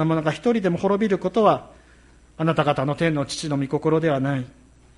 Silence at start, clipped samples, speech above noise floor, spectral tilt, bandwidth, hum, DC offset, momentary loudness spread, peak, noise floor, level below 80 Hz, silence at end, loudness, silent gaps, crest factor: 0 s; under 0.1%; 30 dB; -6.5 dB/octave; 11.5 kHz; none; under 0.1%; 7 LU; -4 dBFS; -52 dBFS; -52 dBFS; 0.5 s; -22 LUFS; none; 18 dB